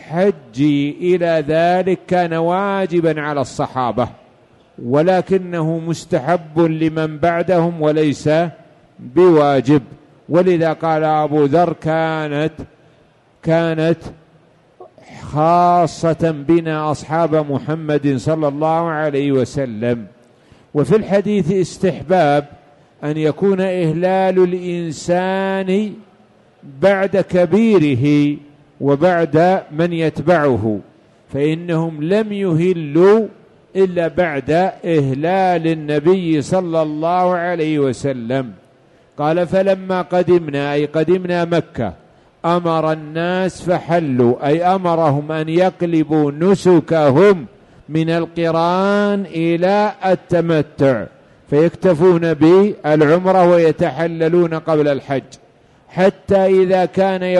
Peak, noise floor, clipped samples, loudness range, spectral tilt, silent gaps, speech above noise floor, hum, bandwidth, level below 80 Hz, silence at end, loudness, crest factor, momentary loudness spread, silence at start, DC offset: -2 dBFS; -52 dBFS; under 0.1%; 4 LU; -7.5 dB/octave; none; 37 dB; none; 11.5 kHz; -52 dBFS; 0 s; -16 LUFS; 14 dB; 8 LU; 0 s; under 0.1%